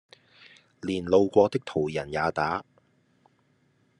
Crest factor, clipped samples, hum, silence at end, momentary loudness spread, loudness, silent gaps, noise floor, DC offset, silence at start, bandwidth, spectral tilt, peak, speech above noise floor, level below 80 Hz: 22 dB; under 0.1%; none; 1.35 s; 11 LU; -26 LUFS; none; -67 dBFS; under 0.1%; 0.85 s; 10.5 kHz; -6.5 dB/octave; -6 dBFS; 42 dB; -62 dBFS